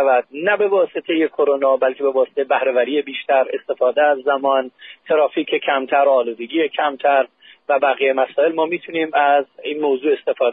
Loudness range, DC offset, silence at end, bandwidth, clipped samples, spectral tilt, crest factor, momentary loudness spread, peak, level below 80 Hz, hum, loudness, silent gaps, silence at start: 1 LU; under 0.1%; 0 s; 4 kHz; under 0.1%; -1 dB/octave; 14 dB; 5 LU; -4 dBFS; -78 dBFS; none; -18 LUFS; none; 0 s